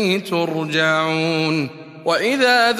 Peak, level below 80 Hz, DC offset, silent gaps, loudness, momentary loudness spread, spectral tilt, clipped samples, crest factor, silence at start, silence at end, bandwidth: -2 dBFS; -68 dBFS; under 0.1%; none; -18 LUFS; 8 LU; -4.5 dB/octave; under 0.1%; 16 dB; 0 s; 0 s; 15 kHz